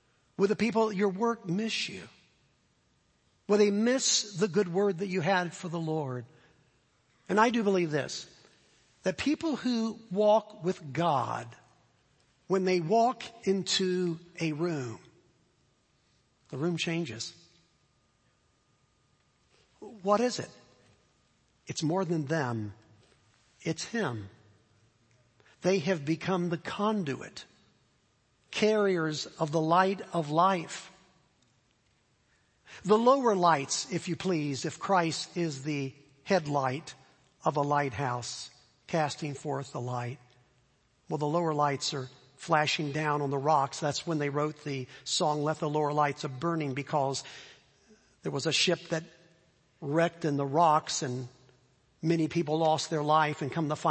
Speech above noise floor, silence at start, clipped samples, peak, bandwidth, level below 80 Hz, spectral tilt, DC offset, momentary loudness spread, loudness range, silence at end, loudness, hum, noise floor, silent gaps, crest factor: 41 dB; 0.4 s; under 0.1%; -10 dBFS; 8.8 kHz; -72 dBFS; -4.5 dB/octave; under 0.1%; 14 LU; 7 LU; 0 s; -30 LUFS; none; -70 dBFS; none; 22 dB